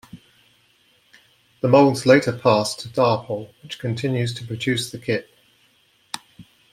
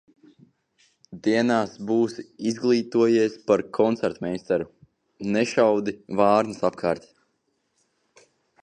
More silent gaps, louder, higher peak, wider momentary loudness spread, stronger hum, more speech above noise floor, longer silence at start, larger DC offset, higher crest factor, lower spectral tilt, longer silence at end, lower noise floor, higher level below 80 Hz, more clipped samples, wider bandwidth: neither; first, -20 LUFS vs -23 LUFS; first, -2 dBFS vs -6 dBFS; first, 18 LU vs 9 LU; neither; second, 40 dB vs 50 dB; second, 0.15 s vs 1.1 s; neither; about the same, 20 dB vs 20 dB; about the same, -5.5 dB/octave vs -6 dB/octave; second, 0.3 s vs 1.65 s; second, -60 dBFS vs -73 dBFS; about the same, -62 dBFS vs -64 dBFS; neither; first, 15.5 kHz vs 9.8 kHz